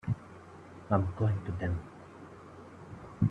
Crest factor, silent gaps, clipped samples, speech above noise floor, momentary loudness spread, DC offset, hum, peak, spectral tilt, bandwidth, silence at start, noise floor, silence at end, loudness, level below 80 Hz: 22 dB; none; under 0.1%; 20 dB; 19 LU; under 0.1%; none; -12 dBFS; -9.5 dB/octave; 7.6 kHz; 0.05 s; -51 dBFS; 0 s; -33 LUFS; -56 dBFS